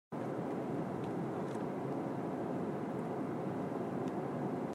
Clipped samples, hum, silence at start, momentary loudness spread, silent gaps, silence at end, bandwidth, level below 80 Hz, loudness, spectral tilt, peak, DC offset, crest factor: under 0.1%; none; 0.1 s; 1 LU; none; 0 s; 14.5 kHz; -78 dBFS; -39 LUFS; -8.5 dB/octave; -26 dBFS; under 0.1%; 12 dB